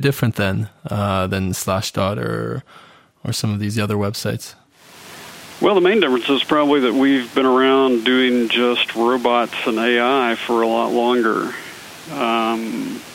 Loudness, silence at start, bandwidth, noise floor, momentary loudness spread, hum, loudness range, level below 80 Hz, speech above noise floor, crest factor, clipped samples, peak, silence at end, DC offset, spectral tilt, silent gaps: -18 LUFS; 0 s; 16 kHz; -43 dBFS; 14 LU; none; 7 LU; -56 dBFS; 25 dB; 18 dB; under 0.1%; -2 dBFS; 0 s; under 0.1%; -5 dB/octave; none